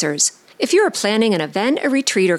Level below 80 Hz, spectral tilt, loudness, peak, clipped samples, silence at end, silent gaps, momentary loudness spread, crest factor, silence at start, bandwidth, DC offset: -70 dBFS; -3 dB/octave; -17 LUFS; -4 dBFS; under 0.1%; 0 s; none; 3 LU; 14 dB; 0 s; 15.5 kHz; under 0.1%